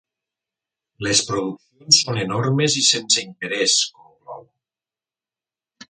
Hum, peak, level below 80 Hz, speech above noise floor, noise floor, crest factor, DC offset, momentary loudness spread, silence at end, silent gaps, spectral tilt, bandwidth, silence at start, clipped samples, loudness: none; 0 dBFS; -60 dBFS; over 70 dB; under -90 dBFS; 22 dB; under 0.1%; 12 LU; 1.5 s; none; -2.5 dB/octave; 11 kHz; 1 s; under 0.1%; -18 LUFS